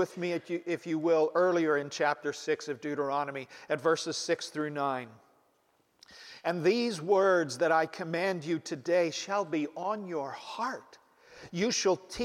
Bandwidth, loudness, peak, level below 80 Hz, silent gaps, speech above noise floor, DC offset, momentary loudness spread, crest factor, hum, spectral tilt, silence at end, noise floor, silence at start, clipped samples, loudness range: 14.5 kHz; -31 LUFS; -14 dBFS; -72 dBFS; none; 41 dB; under 0.1%; 10 LU; 18 dB; none; -4 dB/octave; 0 s; -71 dBFS; 0 s; under 0.1%; 5 LU